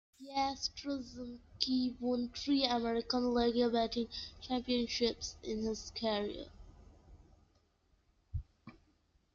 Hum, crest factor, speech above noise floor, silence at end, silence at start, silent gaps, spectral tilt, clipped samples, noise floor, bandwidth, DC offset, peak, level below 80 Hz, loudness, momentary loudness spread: none; 24 dB; 38 dB; 0.65 s; 0.2 s; none; -4 dB/octave; under 0.1%; -74 dBFS; 7.6 kHz; under 0.1%; -14 dBFS; -58 dBFS; -36 LUFS; 15 LU